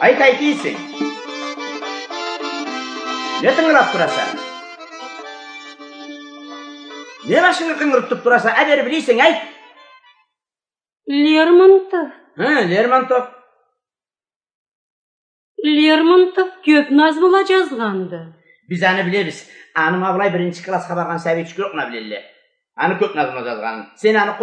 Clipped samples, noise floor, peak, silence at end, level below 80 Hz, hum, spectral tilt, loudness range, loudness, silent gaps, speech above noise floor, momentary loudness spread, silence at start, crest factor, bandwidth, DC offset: under 0.1%; under -90 dBFS; 0 dBFS; 0 s; -70 dBFS; none; -5 dB/octave; 7 LU; -16 LUFS; 14.36-14.40 s, 14.54-15.55 s; over 75 dB; 21 LU; 0 s; 18 dB; 9.6 kHz; under 0.1%